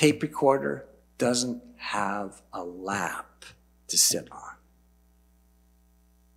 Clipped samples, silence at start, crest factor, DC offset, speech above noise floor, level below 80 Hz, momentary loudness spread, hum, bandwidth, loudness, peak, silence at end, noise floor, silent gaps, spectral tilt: under 0.1%; 0 s; 24 dB; under 0.1%; 34 dB; -62 dBFS; 18 LU; none; 16 kHz; -27 LUFS; -6 dBFS; 1.8 s; -62 dBFS; none; -3 dB/octave